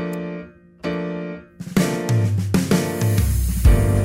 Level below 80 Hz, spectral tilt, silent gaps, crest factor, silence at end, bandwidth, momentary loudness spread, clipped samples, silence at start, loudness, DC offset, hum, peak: -24 dBFS; -6.5 dB/octave; none; 14 dB; 0 s; 16.5 kHz; 14 LU; under 0.1%; 0 s; -21 LUFS; under 0.1%; none; -4 dBFS